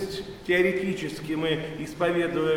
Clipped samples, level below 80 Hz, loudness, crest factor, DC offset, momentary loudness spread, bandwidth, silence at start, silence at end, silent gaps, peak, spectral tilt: under 0.1%; -52 dBFS; -27 LUFS; 16 dB; under 0.1%; 11 LU; 16 kHz; 0 s; 0 s; none; -10 dBFS; -5.5 dB/octave